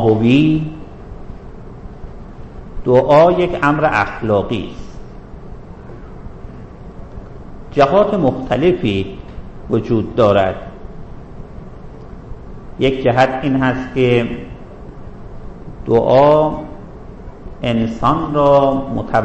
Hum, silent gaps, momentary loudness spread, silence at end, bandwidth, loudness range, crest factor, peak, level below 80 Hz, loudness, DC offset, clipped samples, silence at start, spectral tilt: none; none; 24 LU; 0 s; 8.4 kHz; 5 LU; 16 dB; -2 dBFS; -34 dBFS; -15 LUFS; under 0.1%; under 0.1%; 0 s; -8 dB/octave